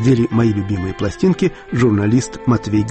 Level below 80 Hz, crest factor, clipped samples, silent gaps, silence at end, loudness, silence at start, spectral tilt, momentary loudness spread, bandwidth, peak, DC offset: -40 dBFS; 12 dB; under 0.1%; none; 0 s; -17 LUFS; 0 s; -7 dB/octave; 6 LU; 8.8 kHz; -4 dBFS; under 0.1%